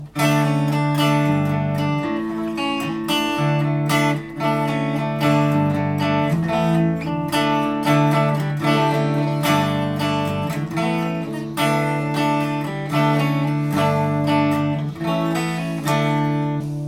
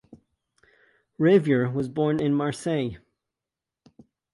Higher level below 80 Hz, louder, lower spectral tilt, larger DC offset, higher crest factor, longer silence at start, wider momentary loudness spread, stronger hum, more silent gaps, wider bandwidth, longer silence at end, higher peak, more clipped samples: first, -52 dBFS vs -62 dBFS; first, -20 LUFS vs -24 LUFS; about the same, -6.5 dB/octave vs -7.5 dB/octave; neither; second, 14 dB vs 20 dB; second, 0 s vs 1.2 s; about the same, 6 LU vs 8 LU; neither; neither; first, 16.5 kHz vs 11.5 kHz; second, 0 s vs 1.35 s; about the same, -6 dBFS vs -6 dBFS; neither